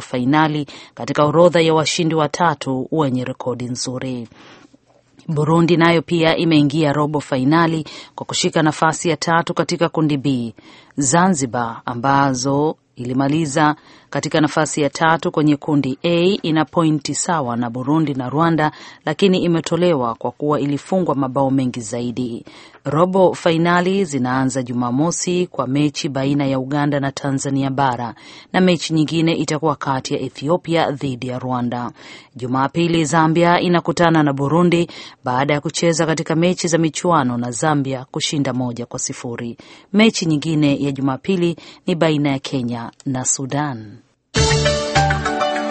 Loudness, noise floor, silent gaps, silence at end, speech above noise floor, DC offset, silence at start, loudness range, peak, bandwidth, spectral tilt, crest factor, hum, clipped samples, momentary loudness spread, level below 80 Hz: -18 LUFS; -53 dBFS; none; 0 s; 36 dB; under 0.1%; 0 s; 3 LU; 0 dBFS; 8.8 kHz; -5 dB/octave; 18 dB; none; under 0.1%; 10 LU; -44 dBFS